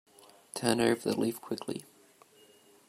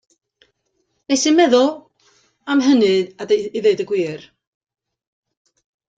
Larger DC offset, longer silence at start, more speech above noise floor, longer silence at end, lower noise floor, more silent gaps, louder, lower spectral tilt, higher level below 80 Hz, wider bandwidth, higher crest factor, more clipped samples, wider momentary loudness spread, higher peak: neither; second, 0.55 s vs 1.1 s; second, 30 dB vs 53 dB; second, 1.05 s vs 1.75 s; second, -61 dBFS vs -69 dBFS; neither; second, -32 LUFS vs -17 LUFS; about the same, -4.5 dB/octave vs -3.5 dB/octave; second, -72 dBFS vs -66 dBFS; first, 16 kHz vs 9.2 kHz; first, 24 dB vs 18 dB; neither; about the same, 14 LU vs 13 LU; second, -10 dBFS vs -2 dBFS